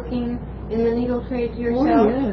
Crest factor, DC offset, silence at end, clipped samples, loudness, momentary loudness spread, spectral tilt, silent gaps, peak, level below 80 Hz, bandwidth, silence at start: 16 dB; under 0.1%; 0 s; under 0.1%; -21 LUFS; 11 LU; -9.5 dB/octave; none; -4 dBFS; -36 dBFS; 5.4 kHz; 0 s